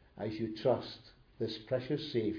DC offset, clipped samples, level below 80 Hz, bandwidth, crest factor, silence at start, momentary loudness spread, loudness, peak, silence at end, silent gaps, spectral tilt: under 0.1%; under 0.1%; -66 dBFS; 5.4 kHz; 18 dB; 0.15 s; 10 LU; -36 LUFS; -18 dBFS; 0 s; none; -5.5 dB/octave